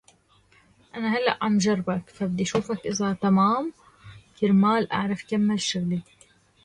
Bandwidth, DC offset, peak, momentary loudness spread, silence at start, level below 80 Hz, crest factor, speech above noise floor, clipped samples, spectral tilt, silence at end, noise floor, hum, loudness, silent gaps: 10.5 kHz; under 0.1%; -6 dBFS; 10 LU; 0.95 s; -60 dBFS; 18 dB; 36 dB; under 0.1%; -5.5 dB/octave; 0.65 s; -60 dBFS; none; -24 LUFS; none